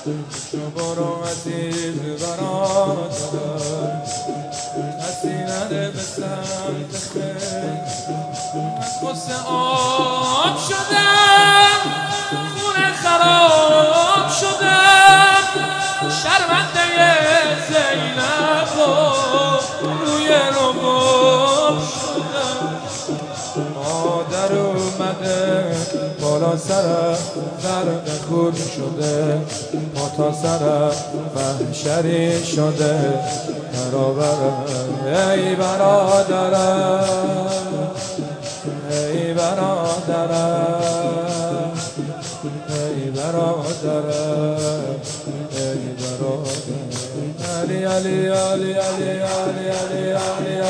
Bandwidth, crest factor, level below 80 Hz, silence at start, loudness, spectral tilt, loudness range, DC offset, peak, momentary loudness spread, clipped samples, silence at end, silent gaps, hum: 13.5 kHz; 18 dB; -58 dBFS; 0 s; -18 LUFS; -3.5 dB/octave; 11 LU; under 0.1%; 0 dBFS; 13 LU; under 0.1%; 0 s; none; none